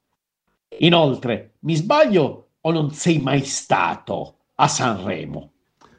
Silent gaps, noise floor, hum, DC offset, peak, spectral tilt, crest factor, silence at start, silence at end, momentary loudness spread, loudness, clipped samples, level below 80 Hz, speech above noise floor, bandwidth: none; -75 dBFS; none; under 0.1%; 0 dBFS; -5 dB/octave; 20 dB; 0.7 s; 0.55 s; 14 LU; -20 LUFS; under 0.1%; -56 dBFS; 56 dB; 9.8 kHz